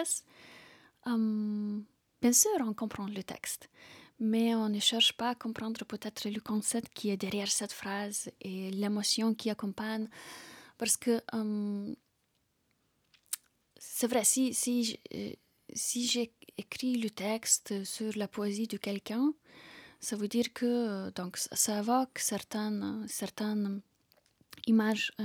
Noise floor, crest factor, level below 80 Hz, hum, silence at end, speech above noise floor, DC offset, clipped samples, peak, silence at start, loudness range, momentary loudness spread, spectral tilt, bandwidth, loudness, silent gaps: -77 dBFS; 22 dB; -76 dBFS; none; 0 s; 44 dB; under 0.1%; under 0.1%; -12 dBFS; 0 s; 4 LU; 14 LU; -3 dB/octave; over 20 kHz; -32 LUFS; none